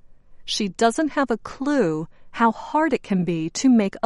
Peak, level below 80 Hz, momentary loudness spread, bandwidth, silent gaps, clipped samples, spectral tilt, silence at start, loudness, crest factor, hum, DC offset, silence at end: -6 dBFS; -52 dBFS; 8 LU; 11.5 kHz; none; under 0.1%; -5 dB/octave; 0.1 s; -22 LUFS; 16 dB; none; under 0.1%; 0.05 s